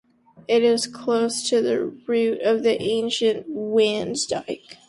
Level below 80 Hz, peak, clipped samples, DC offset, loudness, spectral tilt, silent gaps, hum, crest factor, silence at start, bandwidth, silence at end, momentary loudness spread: -64 dBFS; -8 dBFS; under 0.1%; under 0.1%; -22 LUFS; -3.5 dB/octave; none; none; 14 dB; 0.5 s; 11.5 kHz; 0.15 s; 6 LU